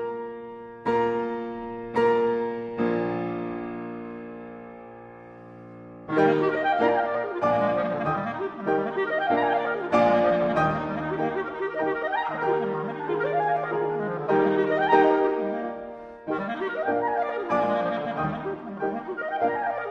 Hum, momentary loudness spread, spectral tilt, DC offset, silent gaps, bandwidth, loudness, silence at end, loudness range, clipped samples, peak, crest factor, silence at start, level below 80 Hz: none; 17 LU; -7.5 dB/octave; under 0.1%; none; 7.2 kHz; -25 LUFS; 0 s; 4 LU; under 0.1%; -6 dBFS; 20 dB; 0 s; -60 dBFS